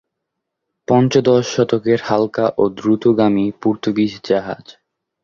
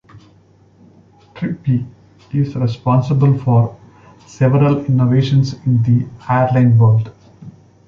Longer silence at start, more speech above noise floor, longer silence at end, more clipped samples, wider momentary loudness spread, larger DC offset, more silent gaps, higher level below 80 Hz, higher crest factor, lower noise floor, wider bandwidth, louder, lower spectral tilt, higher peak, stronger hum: first, 0.9 s vs 0.15 s; first, 62 dB vs 36 dB; about the same, 0.5 s vs 0.4 s; neither; second, 6 LU vs 10 LU; neither; neither; second, -54 dBFS vs -48 dBFS; about the same, 16 dB vs 14 dB; first, -78 dBFS vs -49 dBFS; about the same, 7.4 kHz vs 7 kHz; about the same, -16 LUFS vs -15 LUFS; second, -6.5 dB/octave vs -9 dB/octave; about the same, 0 dBFS vs -2 dBFS; neither